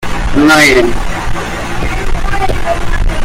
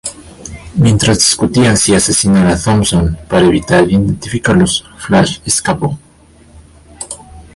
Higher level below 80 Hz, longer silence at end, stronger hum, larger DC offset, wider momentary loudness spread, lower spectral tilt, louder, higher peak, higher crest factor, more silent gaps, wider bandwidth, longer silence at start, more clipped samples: first, -16 dBFS vs -30 dBFS; second, 0 s vs 0.15 s; neither; neither; second, 13 LU vs 17 LU; about the same, -4.5 dB/octave vs -4.5 dB/octave; about the same, -12 LUFS vs -11 LUFS; about the same, 0 dBFS vs 0 dBFS; about the same, 10 dB vs 12 dB; neither; first, 16 kHz vs 11.5 kHz; about the same, 0 s vs 0.05 s; neither